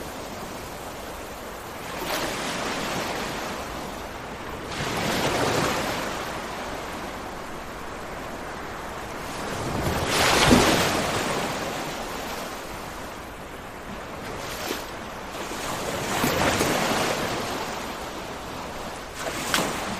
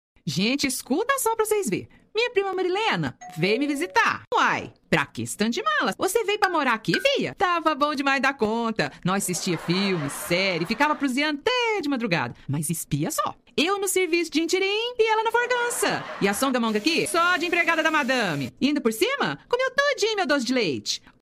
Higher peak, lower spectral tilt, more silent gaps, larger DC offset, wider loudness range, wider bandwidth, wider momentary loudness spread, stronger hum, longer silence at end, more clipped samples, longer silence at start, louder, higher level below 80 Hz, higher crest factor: about the same, -4 dBFS vs -4 dBFS; about the same, -3.5 dB/octave vs -3.5 dB/octave; second, none vs 4.27-4.31 s; neither; first, 11 LU vs 2 LU; about the same, 15.5 kHz vs 15.5 kHz; first, 13 LU vs 5 LU; neither; second, 0 s vs 0.25 s; neither; second, 0 s vs 0.25 s; second, -27 LUFS vs -23 LUFS; first, -44 dBFS vs -58 dBFS; about the same, 24 dB vs 20 dB